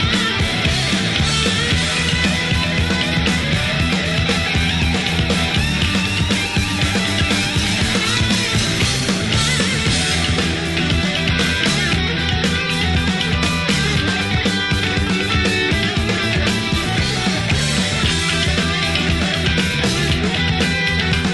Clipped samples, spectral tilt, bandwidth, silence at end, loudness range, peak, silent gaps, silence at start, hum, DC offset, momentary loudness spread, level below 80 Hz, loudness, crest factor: under 0.1%; -4 dB/octave; 12 kHz; 0 s; 1 LU; -4 dBFS; none; 0 s; none; under 0.1%; 2 LU; -28 dBFS; -17 LUFS; 14 dB